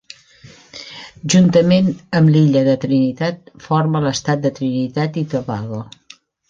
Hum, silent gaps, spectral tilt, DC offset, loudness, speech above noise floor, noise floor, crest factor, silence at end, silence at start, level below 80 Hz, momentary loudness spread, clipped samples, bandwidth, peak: none; none; -6.5 dB/octave; under 0.1%; -16 LUFS; 31 dB; -47 dBFS; 14 dB; 0.65 s; 0.75 s; -52 dBFS; 20 LU; under 0.1%; 7.8 kHz; -2 dBFS